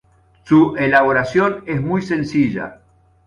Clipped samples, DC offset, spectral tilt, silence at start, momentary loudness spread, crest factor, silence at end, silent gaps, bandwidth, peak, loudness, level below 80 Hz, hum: under 0.1%; under 0.1%; -7.5 dB/octave; 0.45 s; 8 LU; 16 dB; 0.55 s; none; 7.2 kHz; -2 dBFS; -16 LUFS; -50 dBFS; none